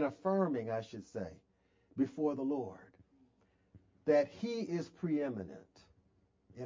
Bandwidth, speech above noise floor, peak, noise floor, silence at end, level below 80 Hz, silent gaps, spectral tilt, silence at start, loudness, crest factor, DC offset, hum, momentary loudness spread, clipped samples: 7.6 kHz; 37 dB; -18 dBFS; -73 dBFS; 0 s; -72 dBFS; none; -7.5 dB/octave; 0 s; -37 LUFS; 20 dB; under 0.1%; none; 16 LU; under 0.1%